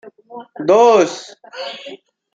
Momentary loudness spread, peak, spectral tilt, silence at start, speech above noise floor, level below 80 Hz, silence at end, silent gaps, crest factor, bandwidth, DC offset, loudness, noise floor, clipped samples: 25 LU; 0 dBFS; -4 dB/octave; 0.05 s; 23 dB; -66 dBFS; 0.4 s; none; 16 dB; 7.8 kHz; under 0.1%; -13 LUFS; -37 dBFS; under 0.1%